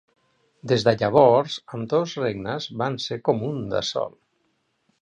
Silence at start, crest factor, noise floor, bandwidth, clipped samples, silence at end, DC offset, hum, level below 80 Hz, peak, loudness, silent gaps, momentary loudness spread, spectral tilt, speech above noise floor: 0.65 s; 20 dB; -70 dBFS; 9.4 kHz; under 0.1%; 0.95 s; under 0.1%; none; -58 dBFS; -4 dBFS; -23 LUFS; none; 13 LU; -5.5 dB/octave; 48 dB